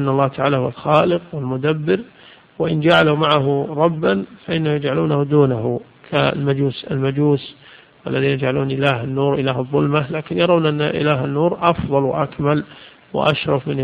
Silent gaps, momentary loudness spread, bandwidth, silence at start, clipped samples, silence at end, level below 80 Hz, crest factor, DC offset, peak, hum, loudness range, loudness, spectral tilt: none; 7 LU; 5.2 kHz; 0 s; under 0.1%; 0 s; -48 dBFS; 18 dB; under 0.1%; 0 dBFS; none; 2 LU; -18 LUFS; -8.5 dB/octave